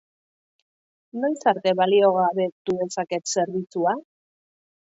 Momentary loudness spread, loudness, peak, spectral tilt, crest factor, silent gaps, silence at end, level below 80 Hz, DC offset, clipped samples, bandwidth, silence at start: 9 LU; -23 LUFS; -6 dBFS; -4.5 dB/octave; 18 dB; 2.52-2.65 s; 0.85 s; -72 dBFS; under 0.1%; under 0.1%; 8 kHz; 1.15 s